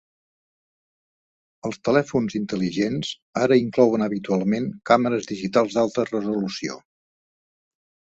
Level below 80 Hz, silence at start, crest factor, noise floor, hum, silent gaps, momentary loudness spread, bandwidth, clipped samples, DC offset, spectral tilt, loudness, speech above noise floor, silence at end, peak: -62 dBFS; 1.65 s; 20 dB; under -90 dBFS; none; 3.22-3.33 s; 10 LU; 8 kHz; under 0.1%; under 0.1%; -6 dB/octave; -23 LUFS; over 68 dB; 1.4 s; -2 dBFS